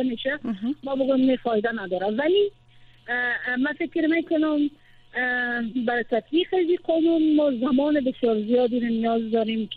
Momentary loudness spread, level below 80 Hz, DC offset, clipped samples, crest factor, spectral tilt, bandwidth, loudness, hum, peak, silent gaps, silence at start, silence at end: 7 LU; -60 dBFS; under 0.1%; under 0.1%; 12 dB; -8 dB/octave; 4.7 kHz; -23 LUFS; none; -10 dBFS; none; 0 s; 0 s